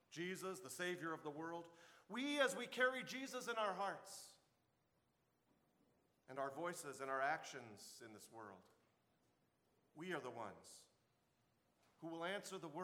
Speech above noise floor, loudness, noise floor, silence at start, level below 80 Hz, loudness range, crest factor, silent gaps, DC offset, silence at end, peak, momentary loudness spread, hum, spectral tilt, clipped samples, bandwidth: 36 dB; -46 LUFS; -83 dBFS; 0.1 s; under -90 dBFS; 12 LU; 26 dB; none; under 0.1%; 0 s; -24 dBFS; 19 LU; none; -3 dB/octave; under 0.1%; 18 kHz